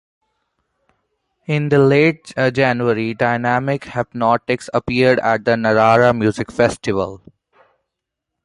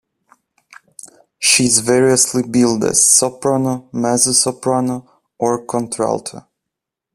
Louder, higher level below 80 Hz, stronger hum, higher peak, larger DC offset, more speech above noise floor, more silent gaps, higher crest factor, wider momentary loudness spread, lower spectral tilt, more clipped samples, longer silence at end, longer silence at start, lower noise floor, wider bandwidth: about the same, -16 LUFS vs -14 LUFS; about the same, -50 dBFS vs -54 dBFS; neither; about the same, -2 dBFS vs 0 dBFS; neither; about the same, 64 dB vs 66 dB; neither; about the same, 16 dB vs 18 dB; about the same, 9 LU vs 11 LU; first, -6.5 dB/octave vs -3 dB/octave; neither; first, 1.3 s vs 0.75 s; first, 1.5 s vs 1.05 s; about the same, -80 dBFS vs -82 dBFS; second, 11.5 kHz vs 15 kHz